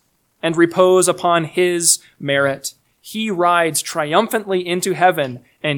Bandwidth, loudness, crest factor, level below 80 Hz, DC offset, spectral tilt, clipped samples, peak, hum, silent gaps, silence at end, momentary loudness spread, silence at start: 19 kHz; -17 LUFS; 18 dB; -66 dBFS; under 0.1%; -3.5 dB/octave; under 0.1%; 0 dBFS; none; none; 0 s; 11 LU; 0.45 s